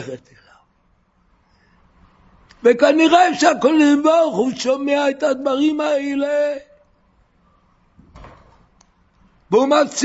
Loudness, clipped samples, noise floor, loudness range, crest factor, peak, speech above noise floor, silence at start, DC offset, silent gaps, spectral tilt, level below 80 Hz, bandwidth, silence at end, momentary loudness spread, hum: -16 LUFS; under 0.1%; -60 dBFS; 11 LU; 18 dB; 0 dBFS; 45 dB; 0 s; under 0.1%; none; -3.5 dB/octave; -58 dBFS; 8 kHz; 0 s; 8 LU; none